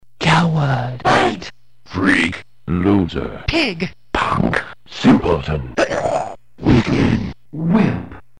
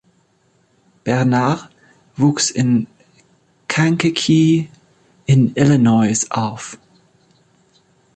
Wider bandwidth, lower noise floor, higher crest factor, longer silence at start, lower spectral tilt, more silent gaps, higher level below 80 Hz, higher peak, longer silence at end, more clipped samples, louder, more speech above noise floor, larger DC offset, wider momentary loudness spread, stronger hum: first, 10.5 kHz vs 9 kHz; second, -38 dBFS vs -59 dBFS; about the same, 14 dB vs 16 dB; second, 0.2 s vs 1.05 s; about the same, -6.5 dB/octave vs -5.5 dB/octave; neither; first, -34 dBFS vs -54 dBFS; about the same, -2 dBFS vs -2 dBFS; second, 0.2 s vs 1.4 s; neither; about the same, -17 LUFS vs -16 LUFS; second, 19 dB vs 44 dB; first, 1% vs under 0.1%; second, 12 LU vs 18 LU; neither